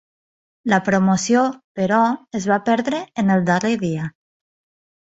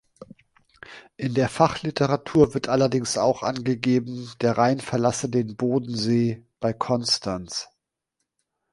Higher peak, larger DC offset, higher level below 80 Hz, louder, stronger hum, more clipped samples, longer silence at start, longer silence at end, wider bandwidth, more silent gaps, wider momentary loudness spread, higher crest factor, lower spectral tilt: about the same, -2 dBFS vs -2 dBFS; neither; about the same, -58 dBFS vs -54 dBFS; first, -19 LUFS vs -23 LUFS; neither; neither; first, 0.65 s vs 0.2 s; second, 0.95 s vs 1.1 s; second, 8 kHz vs 11.5 kHz; first, 1.64-1.75 s vs none; second, 8 LU vs 11 LU; about the same, 18 dB vs 22 dB; about the same, -5.5 dB/octave vs -5.5 dB/octave